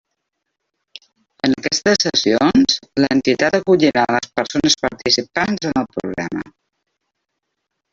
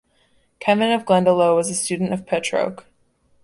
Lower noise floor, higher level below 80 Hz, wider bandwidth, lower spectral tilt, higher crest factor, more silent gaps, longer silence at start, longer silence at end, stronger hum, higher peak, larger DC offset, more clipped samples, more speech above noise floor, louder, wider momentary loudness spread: first, -76 dBFS vs -61 dBFS; first, -52 dBFS vs -60 dBFS; second, 7.8 kHz vs 11.5 kHz; about the same, -3.5 dB/octave vs -4.5 dB/octave; about the same, 18 dB vs 16 dB; neither; first, 1.45 s vs 0.6 s; first, 1.45 s vs 0.65 s; neither; first, 0 dBFS vs -4 dBFS; neither; neither; first, 59 dB vs 42 dB; about the same, -17 LUFS vs -19 LUFS; about the same, 10 LU vs 8 LU